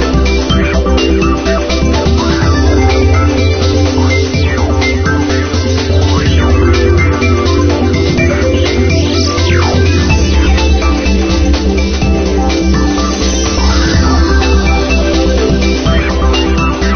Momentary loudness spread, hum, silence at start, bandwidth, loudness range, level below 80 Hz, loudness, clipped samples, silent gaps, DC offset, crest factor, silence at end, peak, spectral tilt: 2 LU; none; 0 s; 6.6 kHz; 1 LU; -14 dBFS; -11 LUFS; under 0.1%; none; under 0.1%; 10 dB; 0 s; 0 dBFS; -5.5 dB/octave